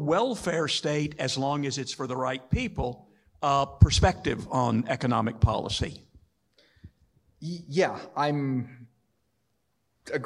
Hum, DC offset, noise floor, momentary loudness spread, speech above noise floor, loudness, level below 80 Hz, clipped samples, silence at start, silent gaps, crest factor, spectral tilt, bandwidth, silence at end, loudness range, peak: none; under 0.1%; -76 dBFS; 11 LU; 49 dB; -27 LUFS; -40 dBFS; under 0.1%; 0 s; none; 24 dB; -5.5 dB/octave; 12 kHz; 0 s; 7 LU; -4 dBFS